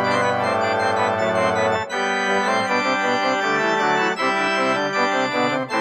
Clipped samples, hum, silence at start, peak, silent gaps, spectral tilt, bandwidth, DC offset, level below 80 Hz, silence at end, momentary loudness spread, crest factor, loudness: under 0.1%; none; 0 s; -6 dBFS; none; -4 dB/octave; 14 kHz; under 0.1%; -64 dBFS; 0 s; 2 LU; 14 dB; -20 LUFS